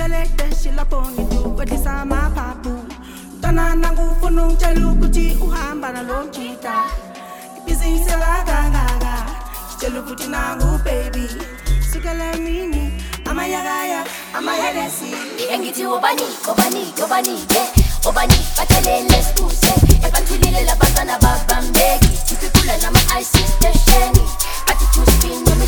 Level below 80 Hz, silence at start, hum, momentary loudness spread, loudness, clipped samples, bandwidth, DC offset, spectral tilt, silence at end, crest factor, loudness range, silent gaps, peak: -18 dBFS; 0 s; none; 12 LU; -17 LUFS; under 0.1%; over 20 kHz; under 0.1%; -4 dB/octave; 0 s; 16 dB; 8 LU; none; 0 dBFS